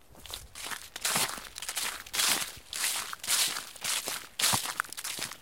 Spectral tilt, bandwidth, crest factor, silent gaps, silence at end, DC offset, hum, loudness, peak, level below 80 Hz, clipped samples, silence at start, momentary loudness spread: 0.5 dB/octave; 17 kHz; 24 dB; none; 0 s; 0.1%; none; -30 LUFS; -8 dBFS; -62 dBFS; under 0.1%; 0.1 s; 12 LU